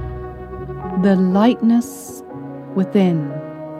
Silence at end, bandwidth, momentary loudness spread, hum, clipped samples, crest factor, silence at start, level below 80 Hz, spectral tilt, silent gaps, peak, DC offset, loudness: 0 s; 14.5 kHz; 18 LU; none; under 0.1%; 16 dB; 0 s; -42 dBFS; -7.5 dB/octave; none; -2 dBFS; under 0.1%; -17 LUFS